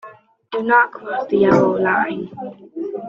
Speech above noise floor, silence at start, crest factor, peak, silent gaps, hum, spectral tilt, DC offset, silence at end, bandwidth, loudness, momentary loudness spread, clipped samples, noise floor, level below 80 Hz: 25 dB; 0.05 s; 18 dB; -2 dBFS; none; none; -7.5 dB/octave; under 0.1%; 0 s; 7.2 kHz; -17 LUFS; 16 LU; under 0.1%; -42 dBFS; -58 dBFS